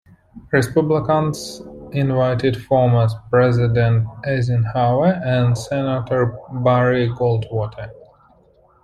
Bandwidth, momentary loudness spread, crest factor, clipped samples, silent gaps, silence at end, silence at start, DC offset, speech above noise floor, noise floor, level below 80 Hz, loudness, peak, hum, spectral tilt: 12.5 kHz; 9 LU; 16 dB; under 0.1%; none; 0.9 s; 0.35 s; under 0.1%; 36 dB; -54 dBFS; -46 dBFS; -18 LUFS; -2 dBFS; none; -7.5 dB/octave